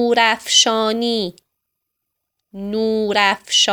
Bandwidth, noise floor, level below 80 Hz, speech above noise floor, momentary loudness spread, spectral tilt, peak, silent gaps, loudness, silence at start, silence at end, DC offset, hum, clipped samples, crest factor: 20 kHz; -78 dBFS; -60 dBFS; 61 dB; 12 LU; -1.5 dB/octave; 0 dBFS; none; -16 LUFS; 0 s; 0 s; under 0.1%; none; under 0.1%; 18 dB